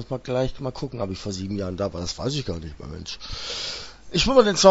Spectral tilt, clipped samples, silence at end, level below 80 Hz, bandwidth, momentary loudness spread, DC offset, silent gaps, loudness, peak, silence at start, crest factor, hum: -4.5 dB/octave; under 0.1%; 0 s; -40 dBFS; 8 kHz; 17 LU; under 0.1%; none; -25 LUFS; 0 dBFS; 0 s; 22 dB; none